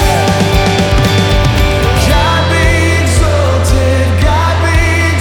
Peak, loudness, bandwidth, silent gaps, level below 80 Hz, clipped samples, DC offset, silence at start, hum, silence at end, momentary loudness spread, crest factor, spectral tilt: 0 dBFS; -10 LUFS; 17.5 kHz; none; -16 dBFS; under 0.1%; under 0.1%; 0 s; none; 0 s; 1 LU; 10 dB; -5 dB/octave